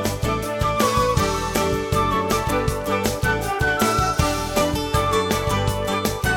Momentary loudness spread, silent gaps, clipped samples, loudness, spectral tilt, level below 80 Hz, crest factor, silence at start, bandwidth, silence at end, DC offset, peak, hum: 4 LU; none; under 0.1%; -21 LUFS; -4.5 dB/octave; -32 dBFS; 16 dB; 0 s; 18 kHz; 0 s; under 0.1%; -4 dBFS; none